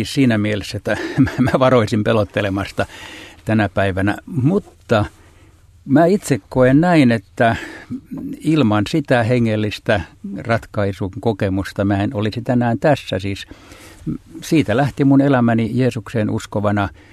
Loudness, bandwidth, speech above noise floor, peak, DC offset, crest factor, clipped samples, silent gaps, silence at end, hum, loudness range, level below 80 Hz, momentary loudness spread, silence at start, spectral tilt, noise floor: -17 LUFS; 13.5 kHz; 30 dB; 0 dBFS; under 0.1%; 18 dB; under 0.1%; none; 0.25 s; none; 4 LU; -46 dBFS; 14 LU; 0 s; -7 dB/octave; -47 dBFS